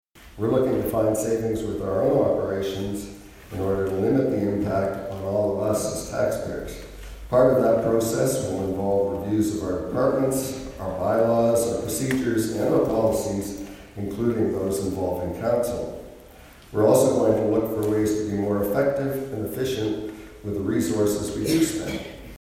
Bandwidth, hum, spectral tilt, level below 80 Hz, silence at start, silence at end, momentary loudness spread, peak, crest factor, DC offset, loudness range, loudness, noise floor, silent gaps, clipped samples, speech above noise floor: 16 kHz; none; -6 dB/octave; -46 dBFS; 0.15 s; 0.05 s; 12 LU; -6 dBFS; 18 dB; under 0.1%; 3 LU; -24 LUFS; -47 dBFS; none; under 0.1%; 24 dB